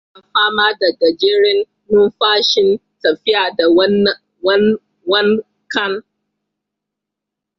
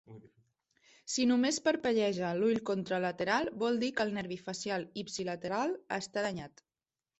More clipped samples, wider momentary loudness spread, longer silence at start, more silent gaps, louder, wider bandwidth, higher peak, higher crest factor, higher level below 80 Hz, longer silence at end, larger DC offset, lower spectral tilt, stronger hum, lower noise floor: neither; about the same, 8 LU vs 9 LU; first, 0.35 s vs 0.1 s; neither; first, -14 LUFS vs -33 LUFS; second, 7.2 kHz vs 8.4 kHz; first, -2 dBFS vs -16 dBFS; about the same, 14 dB vs 18 dB; first, -58 dBFS vs -72 dBFS; first, 1.6 s vs 0.7 s; neither; about the same, -4.5 dB/octave vs -4 dB/octave; neither; second, -81 dBFS vs under -90 dBFS